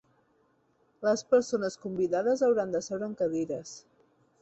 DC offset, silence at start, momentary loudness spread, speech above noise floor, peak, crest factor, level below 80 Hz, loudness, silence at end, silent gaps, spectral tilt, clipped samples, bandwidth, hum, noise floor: under 0.1%; 1 s; 10 LU; 41 dB; -12 dBFS; 18 dB; -72 dBFS; -29 LUFS; 0.6 s; none; -5 dB/octave; under 0.1%; 8.2 kHz; none; -69 dBFS